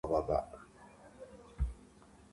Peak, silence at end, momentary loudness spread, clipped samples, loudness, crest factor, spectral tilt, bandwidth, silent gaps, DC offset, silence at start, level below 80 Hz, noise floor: -18 dBFS; 0.5 s; 24 LU; under 0.1%; -37 LUFS; 20 dB; -8 dB/octave; 11.5 kHz; none; under 0.1%; 0.05 s; -46 dBFS; -60 dBFS